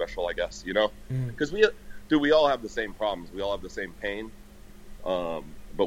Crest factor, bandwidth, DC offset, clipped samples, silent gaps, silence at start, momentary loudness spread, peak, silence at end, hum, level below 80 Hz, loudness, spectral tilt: 22 dB; 16 kHz; under 0.1%; under 0.1%; none; 0 s; 15 LU; -6 dBFS; 0 s; none; -48 dBFS; -28 LUFS; -5.5 dB/octave